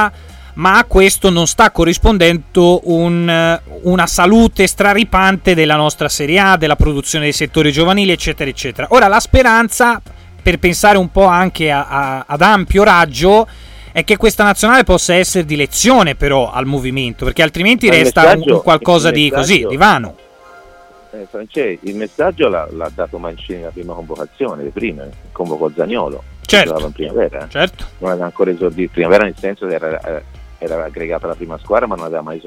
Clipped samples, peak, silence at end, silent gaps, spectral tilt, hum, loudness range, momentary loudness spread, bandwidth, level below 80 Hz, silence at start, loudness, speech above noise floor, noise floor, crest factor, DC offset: under 0.1%; 0 dBFS; 0.05 s; none; -4 dB/octave; none; 10 LU; 14 LU; 17 kHz; -28 dBFS; 0 s; -12 LUFS; 29 dB; -41 dBFS; 12 dB; under 0.1%